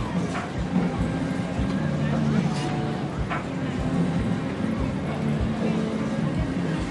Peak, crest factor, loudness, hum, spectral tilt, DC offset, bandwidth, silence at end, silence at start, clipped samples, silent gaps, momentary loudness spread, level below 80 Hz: -10 dBFS; 16 dB; -26 LUFS; none; -7 dB/octave; under 0.1%; 11.5 kHz; 0 s; 0 s; under 0.1%; none; 4 LU; -38 dBFS